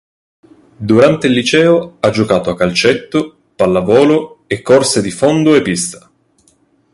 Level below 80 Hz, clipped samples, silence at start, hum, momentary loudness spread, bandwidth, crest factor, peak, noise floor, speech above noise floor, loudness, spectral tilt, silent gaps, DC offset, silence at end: -46 dBFS; under 0.1%; 0.8 s; none; 9 LU; 11.5 kHz; 12 dB; 0 dBFS; -54 dBFS; 43 dB; -12 LUFS; -5 dB/octave; none; under 0.1%; 0.95 s